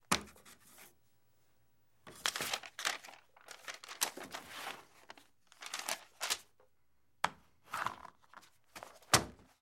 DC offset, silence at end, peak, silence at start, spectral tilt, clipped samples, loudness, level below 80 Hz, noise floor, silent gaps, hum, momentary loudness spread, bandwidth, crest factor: under 0.1%; 0.2 s; -10 dBFS; 0.1 s; -1.5 dB/octave; under 0.1%; -38 LUFS; -68 dBFS; -80 dBFS; none; none; 23 LU; 16 kHz; 32 dB